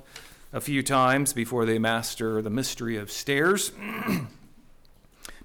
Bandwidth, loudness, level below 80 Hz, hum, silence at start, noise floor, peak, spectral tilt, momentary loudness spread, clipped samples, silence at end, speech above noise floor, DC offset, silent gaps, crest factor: 20 kHz; -26 LUFS; -52 dBFS; none; 0 s; -54 dBFS; -12 dBFS; -4 dB/octave; 18 LU; under 0.1%; 0.05 s; 28 dB; under 0.1%; none; 16 dB